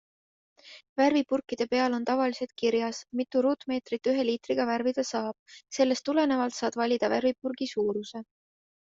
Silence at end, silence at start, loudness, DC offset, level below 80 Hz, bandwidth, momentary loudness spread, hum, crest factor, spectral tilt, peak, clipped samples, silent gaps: 0.75 s; 0.65 s; -28 LUFS; under 0.1%; -72 dBFS; 7.8 kHz; 8 LU; none; 18 dB; -4 dB/octave; -12 dBFS; under 0.1%; 0.89-0.96 s, 5.39-5.46 s